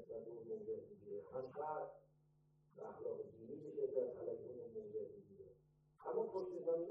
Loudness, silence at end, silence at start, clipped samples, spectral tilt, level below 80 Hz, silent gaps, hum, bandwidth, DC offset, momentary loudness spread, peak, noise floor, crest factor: -48 LUFS; 0 s; 0 s; under 0.1%; -8.5 dB/octave; -84 dBFS; none; none; 5.8 kHz; under 0.1%; 14 LU; -28 dBFS; -75 dBFS; 20 dB